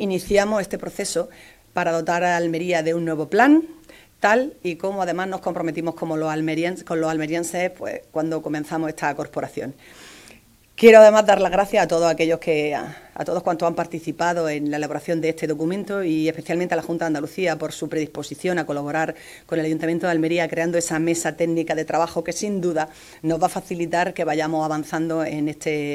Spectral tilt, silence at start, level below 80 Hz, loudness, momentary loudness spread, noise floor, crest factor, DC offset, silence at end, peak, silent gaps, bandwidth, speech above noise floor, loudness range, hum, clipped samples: -5 dB/octave; 0 s; -54 dBFS; -21 LUFS; 9 LU; -51 dBFS; 22 dB; under 0.1%; 0 s; 0 dBFS; none; 16 kHz; 30 dB; 9 LU; none; under 0.1%